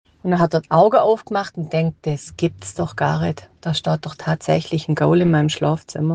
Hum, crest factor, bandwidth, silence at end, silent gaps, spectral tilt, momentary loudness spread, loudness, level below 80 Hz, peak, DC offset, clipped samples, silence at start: none; 16 dB; 9.4 kHz; 0 s; none; -6.5 dB/octave; 10 LU; -19 LUFS; -54 dBFS; -2 dBFS; under 0.1%; under 0.1%; 0.25 s